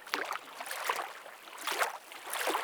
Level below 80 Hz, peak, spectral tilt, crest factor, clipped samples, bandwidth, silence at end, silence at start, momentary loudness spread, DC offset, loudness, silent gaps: under -90 dBFS; -8 dBFS; 0.5 dB/octave; 28 dB; under 0.1%; over 20 kHz; 0 s; 0 s; 11 LU; under 0.1%; -36 LUFS; none